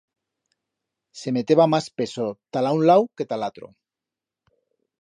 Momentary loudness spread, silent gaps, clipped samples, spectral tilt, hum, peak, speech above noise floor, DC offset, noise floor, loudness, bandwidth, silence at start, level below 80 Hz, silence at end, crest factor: 12 LU; none; under 0.1%; -6.5 dB/octave; none; -4 dBFS; 67 dB; under 0.1%; -88 dBFS; -22 LUFS; 11 kHz; 1.15 s; -70 dBFS; 1.35 s; 20 dB